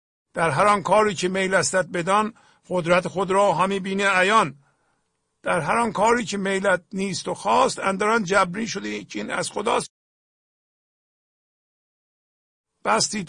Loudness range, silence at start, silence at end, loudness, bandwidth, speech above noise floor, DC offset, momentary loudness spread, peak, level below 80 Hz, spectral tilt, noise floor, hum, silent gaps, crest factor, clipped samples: 9 LU; 0.35 s; 0 s; -22 LUFS; 10.5 kHz; 51 dB; under 0.1%; 10 LU; -6 dBFS; -58 dBFS; -4 dB/octave; -73 dBFS; none; 9.90-12.64 s; 18 dB; under 0.1%